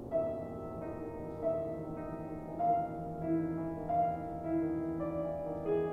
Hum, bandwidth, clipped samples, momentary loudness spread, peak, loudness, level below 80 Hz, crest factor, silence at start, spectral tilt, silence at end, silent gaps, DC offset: none; 4.2 kHz; under 0.1%; 9 LU; -22 dBFS; -37 LUFS; -56 dBFS; 14 dB; 0 s; -10 dB/octave; 0 s; none; under 0.1%